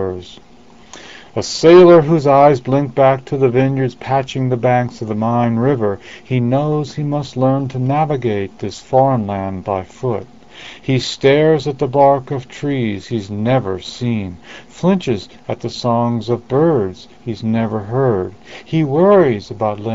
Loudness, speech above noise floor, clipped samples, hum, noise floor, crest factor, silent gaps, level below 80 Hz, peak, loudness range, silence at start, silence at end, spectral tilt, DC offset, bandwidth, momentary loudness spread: -15 LUFS; 26 dB; under 0.1%; none; -41 dBFS; 16 dB; none; -50 dBFS; 0 dBFS; 7 LU; 0 s; 0 s; -7 dB/octave; 0.6%; 7.8 kHz; 14 LU